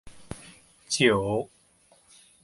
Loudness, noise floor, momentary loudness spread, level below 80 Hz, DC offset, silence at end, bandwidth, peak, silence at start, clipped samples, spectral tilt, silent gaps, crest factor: -25 LUFS; -61 dBFS; 21 LU; -56 dBFS; under 0.1%; 1 s; 11.5 kHz; -8 dBFS; 0.05 s; under 0.1%; -4 dB/octave; none; 22 dB